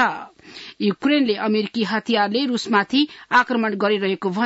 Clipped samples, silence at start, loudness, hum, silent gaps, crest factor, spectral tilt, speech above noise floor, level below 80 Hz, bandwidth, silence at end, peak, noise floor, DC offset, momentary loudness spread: under 0.1%; 0 s; -20 LUFS; none; none; 16 dB; -5 dB/octave; 21 dB; -66 dBFS; 8 kHz; 0 s; -4 dBFS; -41 dBFS; under 0.1%; 6 LU